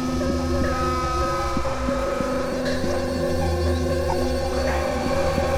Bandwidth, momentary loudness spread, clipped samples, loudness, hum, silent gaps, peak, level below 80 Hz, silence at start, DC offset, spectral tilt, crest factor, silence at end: 16 kHz; 2 LU; under 0.1%; -24 LUFS; none; none; -8 dBFS; -30 dBFS; 0 s; under 0.1%; -6 dB/octave; 14 dB; 0 s